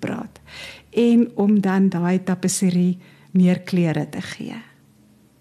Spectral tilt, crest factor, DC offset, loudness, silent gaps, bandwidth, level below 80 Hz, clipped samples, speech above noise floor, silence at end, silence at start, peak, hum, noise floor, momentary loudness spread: -6.5 dB/octave; 12 dB; under 0.1%; -20 LUFS; none; 13.5 kHz; -62 dBFS; under 0.1%; 35 dB; 0.8 s; 0 s; -8 dBFS; none; -54 dBFS; 18 LU